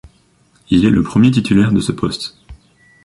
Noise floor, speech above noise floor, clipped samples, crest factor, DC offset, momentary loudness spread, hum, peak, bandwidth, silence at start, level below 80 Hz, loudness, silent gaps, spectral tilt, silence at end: -54 dBFS; 41 dB; under 0.1%; 14 dB; under 0.1%; 10 LU; none; -2 dBFS; 11.5 kHz; 0.7 s; -38 dBFS; -14 LUFS; none; -6.5 dB/octave; 0.5 s